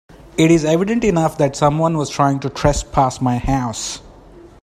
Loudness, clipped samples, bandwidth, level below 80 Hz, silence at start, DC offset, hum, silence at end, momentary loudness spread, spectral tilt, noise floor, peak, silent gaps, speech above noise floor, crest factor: -17 LUFS; under 0.1%; 14.5 kHz; -34 dBFS; 0.25 s; under 0.1%; none; 0.15 s; 9 LU; -6 dB/octave; -42 dBFS; 0 dBFS; none; 26 dB; 18 dB